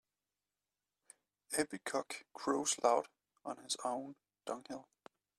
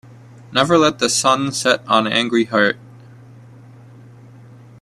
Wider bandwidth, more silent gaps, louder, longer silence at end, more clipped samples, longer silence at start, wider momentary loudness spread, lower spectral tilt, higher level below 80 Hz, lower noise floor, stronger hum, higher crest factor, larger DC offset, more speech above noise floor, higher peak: about the same, 14.5 kHz vs 14.5 kHz; neither; second, -38 LUFS vs -16 LUFS; second, 0.55 s vs 2.05 s; neither; first, 1.5 s vs 0.5 s; first, 18 LU vs 5 LU; about the same, -2 dB/octave vs -3 dB/octave; second, -82 dBFS vs -58 dBFS; first, under -90 dBFS vs -42 dBFS; first, 50 Hz at -80 dBFS vs none; first, 26 dB vs 20 dB; neither; first, over 52 dB vs 26 dB; second, -16 dBFS vs 0 dBFS